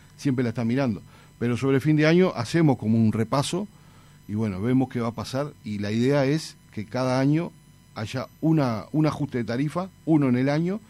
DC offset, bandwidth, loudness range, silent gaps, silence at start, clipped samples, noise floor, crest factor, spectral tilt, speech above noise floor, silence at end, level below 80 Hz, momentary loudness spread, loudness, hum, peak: under 0.1%; 13.5 kHz; 4 LU; none; 0.2 s; under 0.1%; -51 dBFS; 16 dB; -7 dB/octave; 27 dB; 0.1 s; -58 dBFS; 11 LU; -24 LUFS; none; -8 dBFS